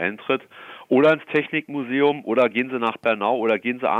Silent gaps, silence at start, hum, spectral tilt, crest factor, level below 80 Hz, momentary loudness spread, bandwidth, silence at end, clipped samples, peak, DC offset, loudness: none; 0 s; none; -7 dB/octave; 14 dB; -72 dBFS; 8 LU; 7.4 kHz; 0 s; under 0.1%; -6 dBFS; under 0.1%; -21 LUFS